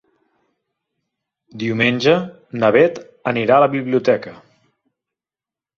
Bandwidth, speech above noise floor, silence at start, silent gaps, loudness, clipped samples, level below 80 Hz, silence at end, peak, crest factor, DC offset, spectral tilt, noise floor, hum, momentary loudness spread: 7 kHz; over 74 dB; 1.55 s; none; -17 LUFS; under 0.1%; -60 dBFS; 1.4 s; -2 dBFS; 18 dB; under 0.1%; -6.5 dB/octave; under -90 dBFS; none; 13 LU